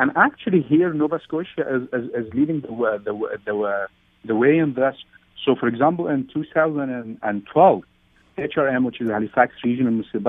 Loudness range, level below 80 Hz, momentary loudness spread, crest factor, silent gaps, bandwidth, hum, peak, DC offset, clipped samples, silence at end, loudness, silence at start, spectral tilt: 2 LU; -62 dBFS; 10 LU; 20 dB; none; 3.9 kHz; none; -2 dBFS; under 0.1%; under 0.1%; 0 s; -21 LUFS; 0 s; -10 dB/octave